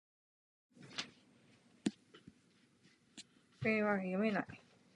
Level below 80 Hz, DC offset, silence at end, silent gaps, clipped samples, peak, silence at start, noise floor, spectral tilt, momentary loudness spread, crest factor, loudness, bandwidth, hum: -78 dBFS; under 0.1%; 0.4 s; none; under 0.1%; -20 dBFS; 0.8 s; -71 dBFS; -5.5 dB/octave; 23 LU; 22 dB; -39 LUFS; 10.5 kHz; none